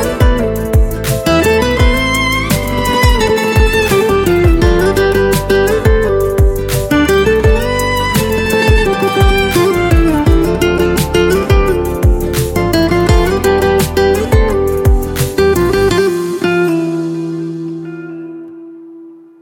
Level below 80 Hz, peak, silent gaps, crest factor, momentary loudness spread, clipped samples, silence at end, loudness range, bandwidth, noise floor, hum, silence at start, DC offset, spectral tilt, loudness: -18 dBFS; 0 dBFS; none; 12 dB; 5 LU; under 0.1%; 0.25 s; 3 LU; 17.5 kHz; -35 dBFS; none; 0 s; under 0.1%; -5.5 dB/octave; -12 LUFS